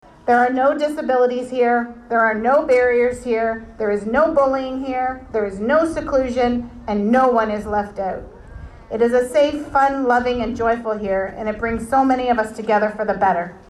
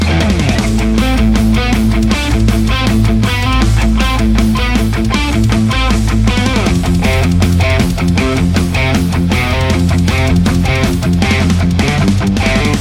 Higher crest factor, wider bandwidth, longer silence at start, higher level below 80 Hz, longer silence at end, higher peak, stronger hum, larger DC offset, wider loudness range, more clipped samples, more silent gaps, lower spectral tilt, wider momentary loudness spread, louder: about the same, 12 dB vs 10 dB; second, 12 kHz vs 16.5 kHz; first, 0.25 s vs 0 s; second, -42 dBFS vs -16 dBFS; about the same, 0.1 s vs 0 s; second, -6 dBFS vs 0 dBFS; neither; neither; about the same, 2 LU vs 0 LU; neither; neither; about the same, -6 dB/octave vs -6 dB/octave; first, 8 LU vs 2 LU; second, -19 LUFS vs -12 LUFS